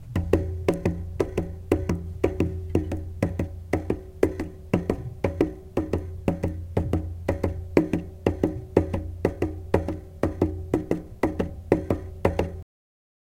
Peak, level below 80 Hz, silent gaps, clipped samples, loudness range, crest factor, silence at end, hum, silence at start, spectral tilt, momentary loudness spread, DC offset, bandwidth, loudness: 0 dBFS; -38 dBFS; none; under 0.1%; 2 LU; 26 dB; 0.75 s; none; 0 s; -8.5 dB/octave; 6 LU; under 0.1%; 16 kHz; -28 LUFS